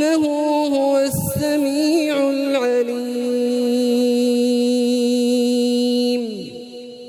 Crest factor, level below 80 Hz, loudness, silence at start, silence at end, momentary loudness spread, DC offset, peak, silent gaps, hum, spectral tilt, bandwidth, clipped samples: 12 dB; -58 dBFS; -18 LUFS; 0 s; 0 s; 5 LU; under 0.1%; -6 dBFS; none; none; -5 dB/octave; 18 kHz; under 0.1%